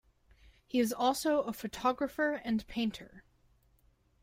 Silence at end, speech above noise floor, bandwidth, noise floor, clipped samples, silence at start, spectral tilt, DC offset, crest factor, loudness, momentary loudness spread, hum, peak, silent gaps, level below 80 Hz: 1.05 s; 36 dB; 16 kHz; -69 dBFS; under 0.1%; 0.75 s; -4 dB/octave; under 0.1%; 18 dB; -33 LUFS; 7 LU; none; -18 dBFS; none; -62 dBFS